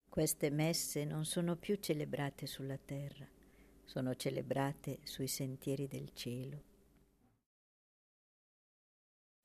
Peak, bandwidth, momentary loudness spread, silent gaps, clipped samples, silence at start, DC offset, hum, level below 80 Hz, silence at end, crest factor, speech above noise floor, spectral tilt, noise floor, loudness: -24 dBFS; 14 kHz; 11 LU; none; under 0.1%; 0.1 s; under 0.1%; none; -68 dBFS; 2.8 s; 18 dB; 33 dB; -5 dB/octave; -72 dBFS; -40 LUFS